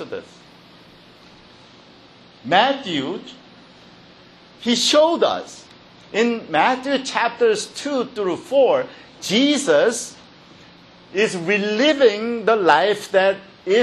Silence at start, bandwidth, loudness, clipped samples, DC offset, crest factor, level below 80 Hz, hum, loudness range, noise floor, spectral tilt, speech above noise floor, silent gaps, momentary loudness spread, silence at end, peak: 0 s; 13 kHz; -19 LUFS; under 0.1%; under 0.1%; 20 dB; -66 dBFS; none; 6 LU; -47 dBFS; -3 dB/octave; 29 dB; none; 14 LU; 0 s; 0 dBFS